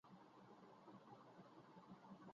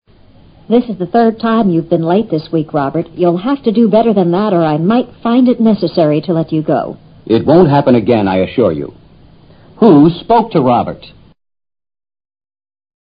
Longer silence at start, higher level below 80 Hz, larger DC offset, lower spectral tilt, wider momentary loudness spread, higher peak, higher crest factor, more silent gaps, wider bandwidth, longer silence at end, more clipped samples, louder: second, 0.05 s vs 0.7 s; second, under -90 dBFS vs -46 dBFS; neither; second, -5.5 dB/octave vs -11.5 dB/octave; second, 3 LU vs 8 LU; second, -50 dBFS vs 0 dBFS; about the same, 14 dB vs 12 dB; neither; first, 7.2 kHz vs 5.2 kHz; second, 0 s vs 1.95 s; neither; second, -65 LUFS vs -12 LUFS